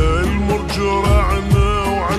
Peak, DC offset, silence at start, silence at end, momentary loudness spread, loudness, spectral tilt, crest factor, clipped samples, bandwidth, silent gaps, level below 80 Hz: -4 dBFS; under 0.1%; 0 s; 0 s; 3 LU; -17 LUFS; -6 dB/octave; 12 dB; under 0.1%; 13 kHz; none; -20 dBFS